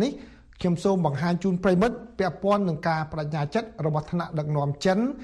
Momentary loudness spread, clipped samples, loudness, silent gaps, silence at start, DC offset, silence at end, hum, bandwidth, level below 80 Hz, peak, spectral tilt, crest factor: 6 LU; under 0.1%; -26 LUFS; none; 0 s; under 0.1%; 0 s; none; 11 kHz; -52 dBFS; -8 dBFS; -7 dB/octave; 16 dB